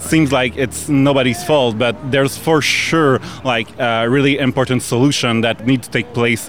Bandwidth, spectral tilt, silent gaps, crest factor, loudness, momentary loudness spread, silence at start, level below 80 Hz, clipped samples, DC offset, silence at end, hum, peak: over 20 kHz; -5 dB/octave; none; 12 dB; -15 LUFS; 5 LU; 0 s; -46 dBFS; under 0.1%; 0.7%; 0 s; none; -2 dBFS